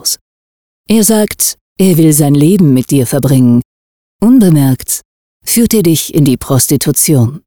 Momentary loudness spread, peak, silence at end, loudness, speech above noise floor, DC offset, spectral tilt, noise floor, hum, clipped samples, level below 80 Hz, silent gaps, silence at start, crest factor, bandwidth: 7 LU; 0 dBFS; 0.1 s; -9 LUFS; over 82 dB; 1%; -5.5 dB/octave; under -90 dBFS; none; under 0.1%; -40 dBFS; 0.21-0.84 s, 1.61-1.76 s, 3.65-4.19 s, 5.05-5.40 s; 0 s; 10 dB; over 20 kHz